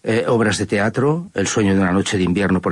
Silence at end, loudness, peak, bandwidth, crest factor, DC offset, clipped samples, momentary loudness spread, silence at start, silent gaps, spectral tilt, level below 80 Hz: 0 s; -18 LUFS; -6 dBFS; 11.5 kHz; 10 dB; under 0.1%; under 0.1%; 3 LU; 0.05 s; none; -5.5 dB/octave; -50 dBFS